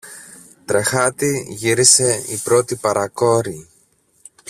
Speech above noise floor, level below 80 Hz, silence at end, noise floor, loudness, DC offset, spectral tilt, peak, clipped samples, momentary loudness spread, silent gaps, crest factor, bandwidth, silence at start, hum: 41 dB; -56 dBFS; 0.85 s; -58 dBFS; -16 LUFS; under 0.1%; -3 dB/octave; 0 dBFS; under 0.1%; 22 LU; none; 18 dB; 16 kHz; 0.05 s; none